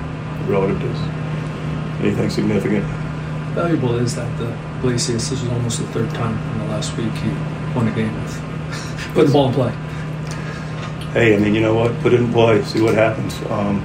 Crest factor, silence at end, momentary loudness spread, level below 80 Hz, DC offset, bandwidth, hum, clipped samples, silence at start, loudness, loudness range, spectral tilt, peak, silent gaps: 16 dB; 0 s; 11 LU; -40 dBFS; under 0.1%; 15.5 kHz; none; under 0.1%; 0 s; -19 LUFS; 5 LU; -6 dB/octave; -2 dBFS; none